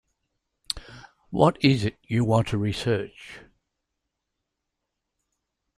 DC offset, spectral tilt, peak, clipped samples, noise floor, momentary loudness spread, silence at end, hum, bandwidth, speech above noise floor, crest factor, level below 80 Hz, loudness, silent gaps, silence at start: under 0.1%; -6.5 dB/octave; -4 dBFS; under 0.1%; -82 dBFS; 15 LU; 2.4 s; none; 12.5 kHz; 59 dB; 24 dB; -52 dBFS; -25 LUFS; none; 0.75 s